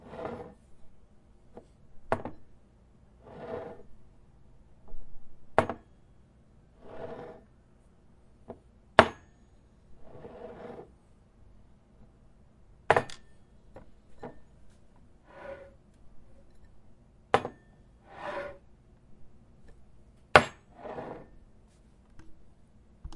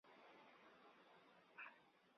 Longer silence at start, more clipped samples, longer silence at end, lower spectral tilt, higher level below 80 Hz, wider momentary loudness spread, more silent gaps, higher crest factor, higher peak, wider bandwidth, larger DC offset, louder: about the same, 0 s vs 0.05 s; neither; about the same, 0 s vs 0 s; first, -4.5 dB/octave vs -1 dB/octave; first, -56 dBFS vs under -90 dBFS; first, 31 LU vs 9 LU; neither; first, 36 dB vs 20 dB; first, 0 dBFS vs -46 dBFS; first, 11.5 kHz vs 6 kHz; neither; first, -30 LUFS vs -64 LUFS